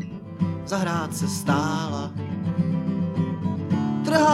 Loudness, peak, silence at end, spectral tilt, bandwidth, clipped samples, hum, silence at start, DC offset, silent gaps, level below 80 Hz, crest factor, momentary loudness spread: -25 LUFS; -6 dBFS; 0 s; -6 dB/octave; 14.5 kHz; under 0.1%; none; 0 s; under 0.1%; none; -58 dBFS; 18 dB; 6 LU